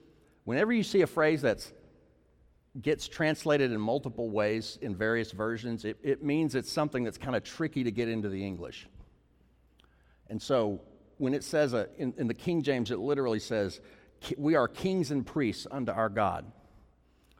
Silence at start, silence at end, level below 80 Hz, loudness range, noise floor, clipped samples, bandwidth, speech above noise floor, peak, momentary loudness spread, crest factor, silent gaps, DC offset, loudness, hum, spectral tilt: 0.45 s; 0.9 s; -62 dBFS; 5 LU; -65 dBFS; under 0.1%; 16 kHz; 34 dB; -14 dBFS; 10 LU; 18 dB; none; under 0.1%; -31 LUFS; none; -6 dB/octave